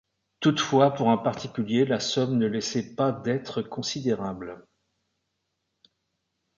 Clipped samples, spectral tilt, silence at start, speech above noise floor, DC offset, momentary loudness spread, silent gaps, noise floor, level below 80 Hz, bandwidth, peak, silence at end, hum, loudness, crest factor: under 0.1%; -5.5 dB/octave; 0.4 s; 54 dB; under 0.1%; 10 LU; none; -79 dBFS; -64 dBFS; 7.6 kHz; -6 dBFS; 2 s; none; -26 LUFS; 20 dB